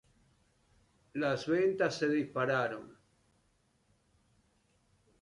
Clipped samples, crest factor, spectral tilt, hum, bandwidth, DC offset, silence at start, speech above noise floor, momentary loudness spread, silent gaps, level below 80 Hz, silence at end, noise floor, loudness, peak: under 0.1%; 18 dB; -6 dB/octave; none; 11 kHz; under 0.1%; 1.15 s; 41 dB; 8 LU; none; -74 dBFS; 2.3 s; -73 dBFS; -32 LUFS; -18 dBFS